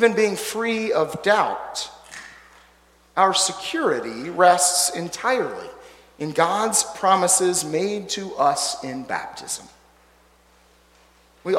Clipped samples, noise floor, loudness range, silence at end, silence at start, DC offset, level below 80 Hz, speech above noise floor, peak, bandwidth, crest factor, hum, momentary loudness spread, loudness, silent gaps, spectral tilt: under 0.1%; -56 dBFS; 6 LU; 0 s; 0 s; under 0.1%; -62 dBFS; 35 dB; -2 dBFS; 16.5 kHz; 20 dB; none; 14 LU; -21 LUFS; none; -2 dB/octave